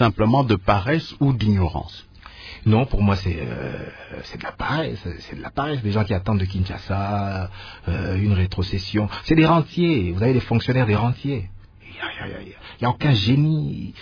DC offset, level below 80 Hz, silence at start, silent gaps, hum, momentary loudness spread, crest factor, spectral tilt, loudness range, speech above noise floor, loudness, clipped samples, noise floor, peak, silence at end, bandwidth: under 0.1%; -38 dBFS; 0 s; none; none; 16 LU; 18 dB; -8 dB/octave; 5 LU; 19 dB; -22 LUFS; under 0.1%; -40 dBFS; -2 dBFS; 0 s; 5.4 kHz